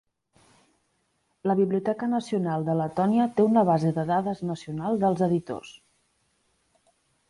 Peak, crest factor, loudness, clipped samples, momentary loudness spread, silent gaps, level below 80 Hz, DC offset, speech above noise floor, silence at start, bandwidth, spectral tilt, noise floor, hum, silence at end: -10 dBFS; 16 dB; -25 LUFS; under 0.1%; 11 LU; none; -64 dBFS; under 0.1%; 48 dB; 1.45 s; 11.5 kHz; -8.5 dB/octave; -72 dBFS; none; 1.6 s